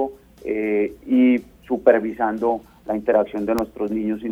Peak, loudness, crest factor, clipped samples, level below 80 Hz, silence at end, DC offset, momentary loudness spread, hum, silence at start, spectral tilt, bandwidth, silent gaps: -2 dBFS; -21 LUFS; 20 dB; under 0.1%; -52 dBFS; 0 s; under 0.1%; 11 LU; none; 0 s; -7.5 dB/octave; 16 kHz; none